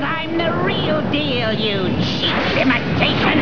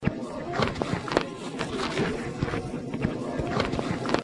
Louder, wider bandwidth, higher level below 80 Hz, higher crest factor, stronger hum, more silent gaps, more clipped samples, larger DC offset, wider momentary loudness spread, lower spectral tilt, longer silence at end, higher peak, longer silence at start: first, -18 LUFS vs -30 LUFS; second, 5.4 kHz vs 11.5 kHz; first, -40 dBFS vs -46 dBFS; second, 16 dB vs 22 dB; neither; neither; neither; first, 2% vs under 0.1%; about the same, 3 LU vs 5 LU; about the same, -6.5 dB/octave vs -6 dB/octave; about the same, 0 s vs 0 s; first, -2 dBFS vs -6 dBFS; about the same, 0 s vs 0 s